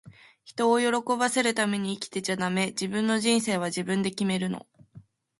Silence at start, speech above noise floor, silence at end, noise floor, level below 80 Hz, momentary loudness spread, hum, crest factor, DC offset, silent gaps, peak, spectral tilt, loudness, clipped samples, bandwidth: 0.05 s; 27 dB; 0.4 s; -53 dBFS; -70 dBFS; 8 LU; none; 18 dB; under 0.1%; none; -10 dBFS; -4 dB/octave; -26 LUFS; under 0.1%; 11.5 kHz